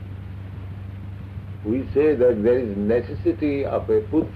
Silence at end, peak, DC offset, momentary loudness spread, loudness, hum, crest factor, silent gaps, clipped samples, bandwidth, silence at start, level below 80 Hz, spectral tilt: 0 s; -10 dBFS; under 0.1%; 18 LU; -21 LUFS; none; 12 dB; none; under 0.1%; 5 kHz; 0 s; -42 dBFS; -10 dB/octave